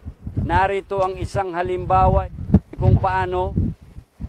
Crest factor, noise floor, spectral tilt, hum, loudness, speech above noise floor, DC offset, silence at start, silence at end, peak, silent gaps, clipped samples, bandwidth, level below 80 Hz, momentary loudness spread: 16 dB; -41 dBFS; -8.5 dB/octave; none; -20 LUFS; 22 dB; under 0.1%; 0.05 s; 0 s; -4 dBFS; none; under 0.1%; 10 kHz; -30 dBFS; 9 LU